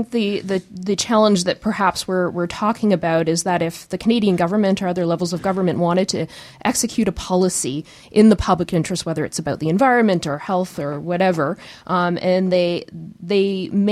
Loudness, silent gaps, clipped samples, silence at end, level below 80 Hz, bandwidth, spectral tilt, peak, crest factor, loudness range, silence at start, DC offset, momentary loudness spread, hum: -19 LUFS; none; under 0.1%; 0 s; -44 dBFS; 14.5 kHz; -5 dB/octave; -2 dBFS; 16 dB; 2 LU; 0 s; under 0.1%; 9 LU; none